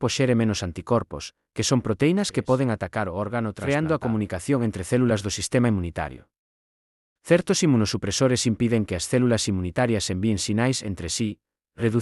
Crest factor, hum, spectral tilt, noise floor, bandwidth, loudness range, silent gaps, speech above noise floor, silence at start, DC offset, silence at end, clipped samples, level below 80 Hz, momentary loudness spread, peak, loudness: 18 dB; none; -5 dB/octave; under -90 dBFS; 12 kHz; 2 LU; 6.39-7.16 s; over 67 dB; 0 s; under 0.1%; 0 s; under 0.1%; -52 dBFS; 7 LU; -6 dBFS; -24 LUFS